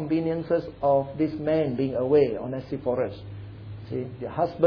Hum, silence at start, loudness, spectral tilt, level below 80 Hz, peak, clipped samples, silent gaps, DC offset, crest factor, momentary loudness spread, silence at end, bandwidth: none; 0 s; -26 LUFS; -10 dB/octave; -54 dBFS; -8 dBFS; under 0.1%; none; under 0.1%; 18 dB; 17 LU; 0 s; 5.4 kHz